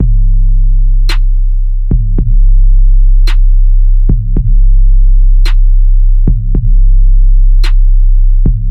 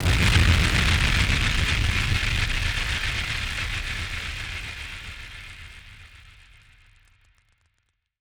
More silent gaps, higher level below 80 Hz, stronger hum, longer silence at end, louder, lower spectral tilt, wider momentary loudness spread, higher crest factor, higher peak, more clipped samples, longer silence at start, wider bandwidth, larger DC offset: neither; first, -4 dBFS vs -30 dBFS; neither; second, 0 s vs 1.9 s; first, -12 LUFS vs -23 LUFS; first, -7 dB/octave vs -3.5 dB/octave; second, 3 LU vs 19 LU; second, 4 dB vs 20 dB; first, 0 dBFS vs -6 dBFS; neither; about the same, 0 s vs 0 s; second, 4.4 kHz vs over 20 kHz; neither